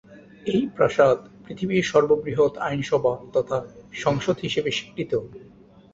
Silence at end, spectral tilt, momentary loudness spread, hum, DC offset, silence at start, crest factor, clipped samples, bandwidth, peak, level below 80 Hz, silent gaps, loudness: 0.45 s; -5.5 dB/octave; 10 LU; none; under 0.1%; 0.1 s; 20 dB; under 0.1%; 7.8 kHz; -4 dBFS; -56 dBFS; none; -23 LUFS